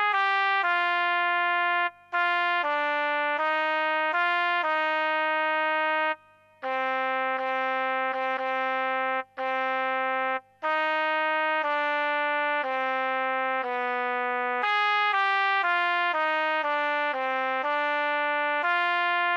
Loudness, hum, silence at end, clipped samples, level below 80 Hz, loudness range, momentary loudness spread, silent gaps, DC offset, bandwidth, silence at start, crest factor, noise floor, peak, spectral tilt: -25 LUFS; 50 Hz at -75 dBFS; 0 s; under 0.1%; -84 dBFS; 3 LU; 4 LU; none; under 0.1%; 8.4 kHz; 0 s; 12 dB; -51 dBFS; -14 dBFS; -2.5 dB/octave